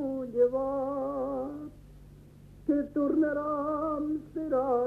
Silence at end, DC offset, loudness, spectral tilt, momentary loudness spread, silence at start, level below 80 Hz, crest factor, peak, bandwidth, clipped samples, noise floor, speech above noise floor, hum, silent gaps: 0 s; under 0.1%; -30 LUFS; -9 dB/octave; 9 LU; 0 s; -56 dBFS; 14 dB; -16 dBFS; 4.3 kHz; under 0.1%; -52 dBFS; 23 dB; none; none